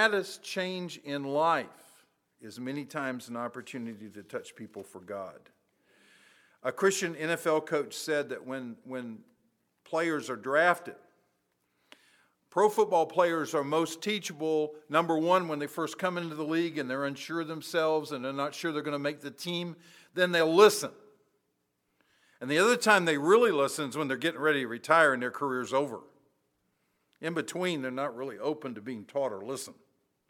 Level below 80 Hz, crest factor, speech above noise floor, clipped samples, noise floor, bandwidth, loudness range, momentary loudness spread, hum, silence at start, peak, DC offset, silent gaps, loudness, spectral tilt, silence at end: -86 dBFS; 24 dB; 49 dB; under 0.1%; -78 dBFS; 18.5 kHz; 10 LU; 17 LU; none; 0 s; -6 dBFS; under 0.1%; none; -29 LUFS; -4 dB/octave; 0.6 s